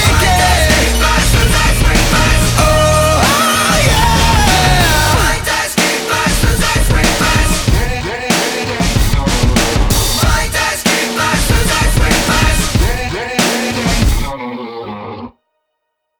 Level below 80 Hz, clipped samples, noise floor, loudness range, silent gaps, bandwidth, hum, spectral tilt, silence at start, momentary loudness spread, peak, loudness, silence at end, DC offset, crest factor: -18 dBFS; under 0.1%; -71 dBFS; 4 LU; none; over 20 kHz; none; -3.5 dB/octave; 0 s; 6 LU; 0 dBFS; -12 LUFS; 0.9 s; under 0.1%; 12 dB